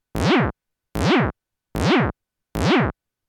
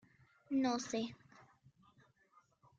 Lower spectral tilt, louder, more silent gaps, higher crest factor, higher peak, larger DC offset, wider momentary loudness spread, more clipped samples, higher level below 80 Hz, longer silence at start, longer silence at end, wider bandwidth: first, -6 dB/octave vs -4 dB/octave; first, -21 LUFS vs -39 LUFS; neither; about the same, 16 dB vs 20 dB; first, -6 dBFS vs -24 dBFS; neither; about the same, 11 LU vs 12 LU; neither; first, -38 dBFS vs -80 dBFS; second, 0.15 s vs 0.5 s; second, 0.35 s vs 1.4 s; first, 19 kHz vs 7.8 kHz